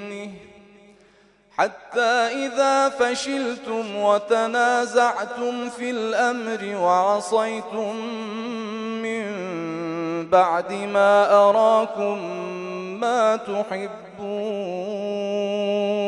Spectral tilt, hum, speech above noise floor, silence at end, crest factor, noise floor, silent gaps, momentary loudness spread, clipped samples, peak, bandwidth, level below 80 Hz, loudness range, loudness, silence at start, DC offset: -4 dB/octave; none; 34 dB; 0 s; 18 dB; -56 dBFS; none; 12 LU; under 0.1%; -4 dBFS; 11 kHz; -70 dBFS; 6 LU; -22 LUFS; 0 s; under 0.1%